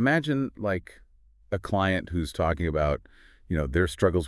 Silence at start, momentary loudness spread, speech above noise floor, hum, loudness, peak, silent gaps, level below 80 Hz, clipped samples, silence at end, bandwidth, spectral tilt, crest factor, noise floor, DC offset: 0 s; 9 LU; 19 dB; none; -28 LUFS; -10 dBFS; none; -42 dBFS; under 0.1%; 0 s; 12 kHz; -6.5 dB/octave; 16 dB; -46 dBFS; under 0.1%